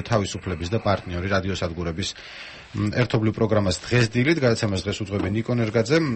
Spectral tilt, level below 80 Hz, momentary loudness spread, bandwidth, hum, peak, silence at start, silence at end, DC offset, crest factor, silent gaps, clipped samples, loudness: -6 dB/octave; -46 dBFS; 9 LU; 8.6 kHz; none; -6 dBFS; 0 s; 0 s; under 0.1%; 16 dB; none; under 0.1%; -23 LUFS